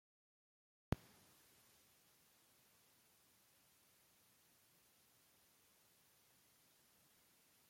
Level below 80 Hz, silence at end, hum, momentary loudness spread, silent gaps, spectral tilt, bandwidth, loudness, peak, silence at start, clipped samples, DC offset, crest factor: -70 dBFS; 0 s; none; 21 LU; none; -6 dB/octave; 16.5 kHz; -48 LUFS; -22 dBFS; 0.9 s; under 0.1%; under 0.1%; 38 dB